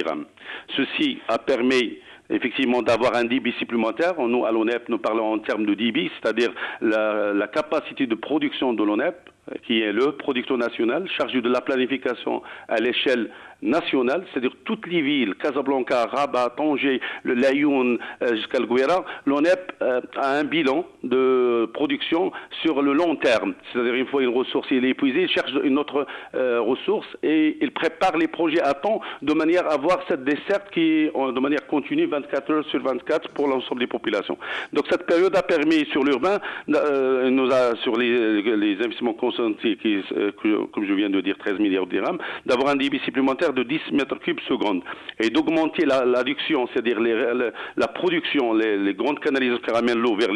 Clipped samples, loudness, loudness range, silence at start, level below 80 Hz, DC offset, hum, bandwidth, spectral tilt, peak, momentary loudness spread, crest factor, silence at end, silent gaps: under 0.1%; -22 LUFS; 2 LU; 0 s; -64 dBFS; under 0.1%; none; 11 kHz; -5.5 dB/octave; -10 dBFS; 6 LU; 12 dB; 0 s; none